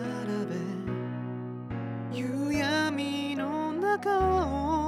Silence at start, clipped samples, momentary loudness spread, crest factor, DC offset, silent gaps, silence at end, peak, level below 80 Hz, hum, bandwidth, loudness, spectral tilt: 0 s; under 0.1%; 10 LU; 14 dB; under 0.1%; none; 0 s; -16 dBFS; -48 dBFS; none; 15 kHz; -30 LUFS; -6 dB/octave